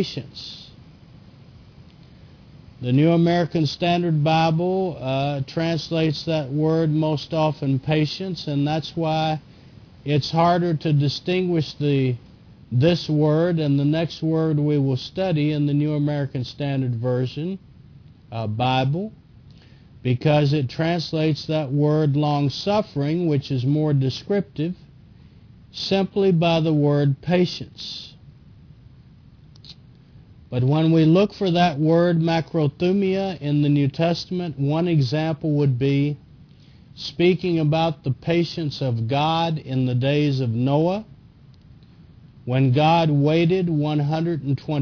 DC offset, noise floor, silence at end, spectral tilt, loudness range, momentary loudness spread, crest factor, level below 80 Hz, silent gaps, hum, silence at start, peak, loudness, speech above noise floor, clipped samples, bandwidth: under 0.1%; -48 dBFS; 0 s; -8 dB/octave; 4 LU; 10 LU; 14 dB; -54 dBFS; none; none; 0 s; -6 dBFS; -21 LUFS; 28 dB; under 0.1%; 5.4 kHz